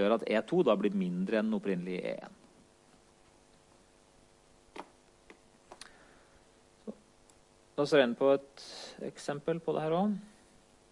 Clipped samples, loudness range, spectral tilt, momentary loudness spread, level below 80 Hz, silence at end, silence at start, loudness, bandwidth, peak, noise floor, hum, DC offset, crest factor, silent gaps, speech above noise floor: under 0.1%; 24 LU; -6.5 dB/octave; 23 LU; -72 dBFS; 0.65 s; 0 s; -32 LUFS; 11.5 kHz; -12 dBFS; -63 dBFS; none; under 0.1%; 22 dB; none; 32 dB